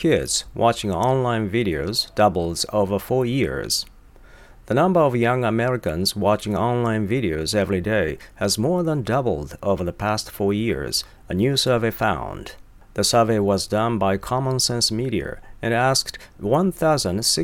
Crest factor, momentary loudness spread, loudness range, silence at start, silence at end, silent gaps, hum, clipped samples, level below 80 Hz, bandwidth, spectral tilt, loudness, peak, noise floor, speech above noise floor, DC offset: 18 dB; 7 LU; 2 LU; 0 s; 0 s; none; none; under 0.1%; -44 dBFS; 18 kHz; -4.5 dB/octave; -21 LUFS; -4 dBFS; -46 dBFS; 25 dB; under 0.1%